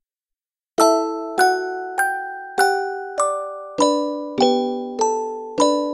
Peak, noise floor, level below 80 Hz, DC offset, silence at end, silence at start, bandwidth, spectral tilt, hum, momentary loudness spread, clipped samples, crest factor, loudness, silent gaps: -2 dBFS; -88 dBFS; -68 dBFS; under 0.1%; 0 s; 0.8 s; 14 kHz; -2 dB/octave; none; 9 LU; under 0.1%; 18 dB; -21 LUFS; none